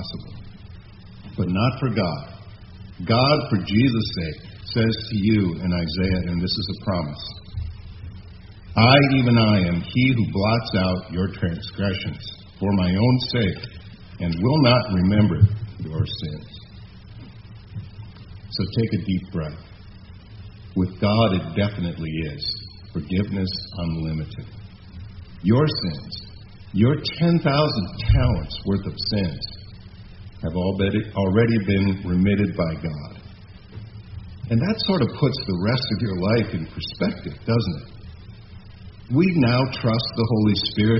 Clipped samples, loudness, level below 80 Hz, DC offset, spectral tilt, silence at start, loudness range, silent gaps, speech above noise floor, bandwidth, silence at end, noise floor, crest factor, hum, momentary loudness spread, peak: under 0.1%; -22 LUFS; -40 dBFS; under 0.1%; -5.5 dB/octave; 0 s; 7 LU; none; 21 dB; 6 kHz; 0 s; -42 dBFS; 22 dB; none; 23 LU; 0 dBFS